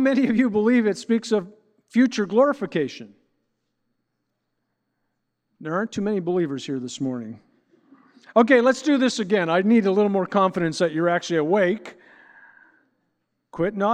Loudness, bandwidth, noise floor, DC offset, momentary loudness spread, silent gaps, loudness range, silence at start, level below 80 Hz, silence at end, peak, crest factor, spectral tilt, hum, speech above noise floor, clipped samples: -22 LUFS; 9.8 kHz; -77 dBFS; under 0.1%; 11 LU; none; 10 LU; 0 s; -68 dBFS; 0 s; -4 dBFS; 20 dB; -6 dB/octave; none; 56 dB; under 0.1%